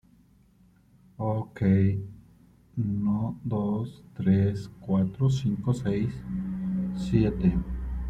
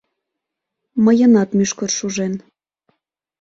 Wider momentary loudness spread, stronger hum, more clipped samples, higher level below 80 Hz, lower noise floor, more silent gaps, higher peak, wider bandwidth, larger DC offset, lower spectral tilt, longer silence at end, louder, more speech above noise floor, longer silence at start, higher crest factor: second, 10 LU vs 13 LU; neither; neither; first, -42 dBFS vs -60 dBFS; second, -60 dBFS vs -80 dBFS; neither; second, -10 dBFS vs -4 dBFS; first, 8.8 kHz vs 7.8 kHz; neither; first, -9 dB/octave vs -5 dB/octave; second, 0 s vs 1.05 s; second, -28 LUFS vs -16 LUFS; second, 34 dB vs 65 dB; first, 1.2 s vs 0.95 s; about the same, 18 dB vs 16 dB